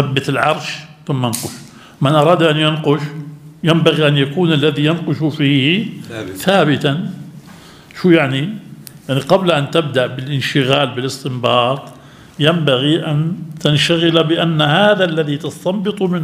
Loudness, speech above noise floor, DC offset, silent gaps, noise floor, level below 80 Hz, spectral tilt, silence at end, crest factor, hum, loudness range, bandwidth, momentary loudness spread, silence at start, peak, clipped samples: -15 LUFS; 24 dB; under 0.1%; none; -39 dBFS; -56 dBFS; -5.5 dB/octave; 0 s; 16 dB; none; 3 LU; 16 kHz; 14 LU; 0 s; 0 dBFS; under 0.1%